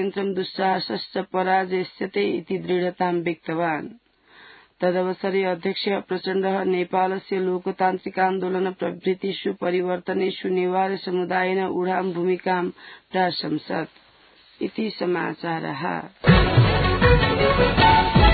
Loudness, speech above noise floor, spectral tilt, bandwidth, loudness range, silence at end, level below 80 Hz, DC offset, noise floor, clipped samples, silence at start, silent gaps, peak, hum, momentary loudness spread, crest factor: -23 LUFS; 31 dB; -11 dB/octave; 4.8 kHz; 6 LU; 0 s; -34 dBFS; under 0.1%; -54 dBFS; under 0.1%; 0 s; none; -4 dBFS; none; 10 LU; 18 dB